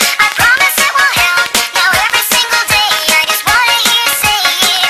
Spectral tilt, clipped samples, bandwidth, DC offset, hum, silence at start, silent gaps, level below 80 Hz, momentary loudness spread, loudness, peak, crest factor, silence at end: 0.5 dB/octave; under 0.1%; 18.5 kHz; under 0.1%; none; 0 s; none; -40 dBFS; 2 LU; -8 LUFS; 0 dBFS; 10 dB; 0 s